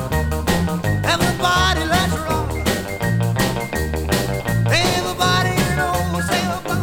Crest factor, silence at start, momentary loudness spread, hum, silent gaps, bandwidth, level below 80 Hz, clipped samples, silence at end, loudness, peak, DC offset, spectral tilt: 16 dB; 0 s; 5 LU; none; none; 18.5 kHz; -30 dBFS; under 0.1%; 0 s; -19 LUFS; -4 dBFS; under 0.1%; -4.5 dB/octave